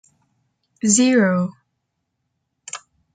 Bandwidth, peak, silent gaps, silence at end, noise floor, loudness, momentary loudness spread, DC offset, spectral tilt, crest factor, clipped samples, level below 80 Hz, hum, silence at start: 9.4 kHz; -2 dBFS; none; 0.4 s; -75 dBFS; -17 LUFS; 20 LU; under 0.1%; -4 dB/octave; 22 dB; under 0.1%; -68 dBFS; none; 0.85 s